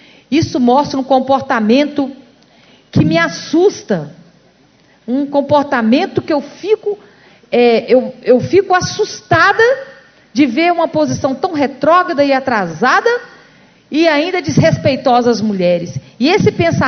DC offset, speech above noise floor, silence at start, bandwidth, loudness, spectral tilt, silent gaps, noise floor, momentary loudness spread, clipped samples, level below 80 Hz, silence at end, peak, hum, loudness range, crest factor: under 0.1%; 37 dB; 0.3 s; 6.6 kHz; -13 LUFS; -5.5 dB/octave; none; -49 dBFS; 9 LU; under 0.1%; -46 dBFS; 0 s; 0 dBFS; none; 4 LU; 14 dB